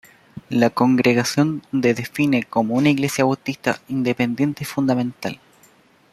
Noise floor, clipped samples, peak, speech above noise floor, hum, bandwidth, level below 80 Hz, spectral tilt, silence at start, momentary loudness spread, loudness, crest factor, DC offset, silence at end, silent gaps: -54 dBFS; under 0.1%; -2 dBFS; 35 dB; none; 14 kHz; -60 dBFS; -5.5 dB/octave; 0.35 s; 7 LU; -20 LUFS; 18 dB; under 0.1%; 0.75 s; none